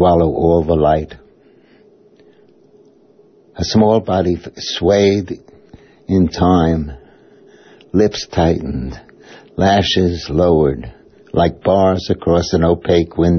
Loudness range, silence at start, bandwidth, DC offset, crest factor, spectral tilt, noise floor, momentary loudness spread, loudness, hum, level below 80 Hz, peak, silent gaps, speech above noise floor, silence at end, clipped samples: 5 LU; 0 s; 6.6 kHz; under 0.1%; 14 dB; -6.5 dB/octave; -49 dBFS; 14 LU; -15 LUFS; none; -34 dBFS; -2 dBFS; none; 35 dB; 0 s; under 0.1%